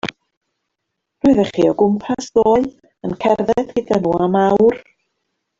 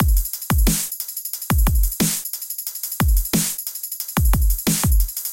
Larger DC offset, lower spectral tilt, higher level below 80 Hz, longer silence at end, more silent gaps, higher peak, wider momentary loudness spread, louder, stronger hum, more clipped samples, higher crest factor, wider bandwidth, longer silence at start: neither; first, -7 dB/octave vs -4 dB/octave; second, -50 dBFS vs -22 dBFS; first, 0.8 s vs 0 s; first, 0.37-0.41 s vs none; about the same, -2 dBFS vs -4 dBFS; first, 12 LU vs 7 LU; first, -16 LUFS vs -21 LUFS; neither; neither; about the same, 16 dB vs 16 dB; second, 7.8 kHz vs 17.5 kHz; about the same, 0.05 s vs 0 s